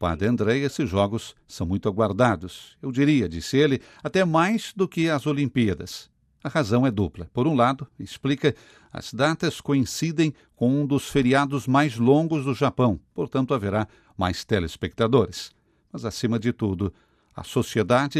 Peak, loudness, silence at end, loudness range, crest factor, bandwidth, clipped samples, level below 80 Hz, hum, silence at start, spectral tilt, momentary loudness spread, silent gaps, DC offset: -6 dBFS; -24 LUFS; 0 s; 4 LU; 18 dB; 14 kHz; under 0.1%; -52 dBFS; none; 0 s; -6 dB/octave; 12 LU; none; under 0.1%